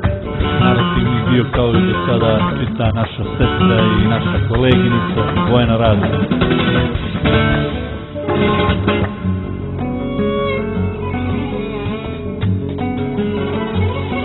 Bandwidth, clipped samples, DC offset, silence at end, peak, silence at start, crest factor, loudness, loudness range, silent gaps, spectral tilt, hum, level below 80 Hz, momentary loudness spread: 4.2 kHz; under 0.1%; under 0.1%; 0 s; 0 dBFS; 0 s; 16 dB; -16 LUFS; 6 LU; none; -10.5 dB/octave; none; -28 dBFS; 8 LU